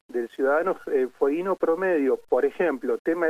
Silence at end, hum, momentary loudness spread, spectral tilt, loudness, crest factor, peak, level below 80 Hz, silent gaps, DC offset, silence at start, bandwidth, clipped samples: 0 s; none; 3 LU; -7 dB/octave; -25 LUFS; 14 dB; -10 dBFS; -68 dBFS; 2.99-3.05 s; under 0.1%; 0.1 s; 15 kHz; under 0.1%